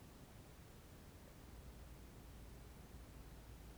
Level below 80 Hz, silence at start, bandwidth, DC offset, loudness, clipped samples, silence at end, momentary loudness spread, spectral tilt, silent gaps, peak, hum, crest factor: -60 dBFS; 0 s; over 20 kHz; under 0.1%; -59 LUFS; under 0.1%; 0 s; 2 LU; -5 dB/octave; none; -44 dBFS; none; 14 dB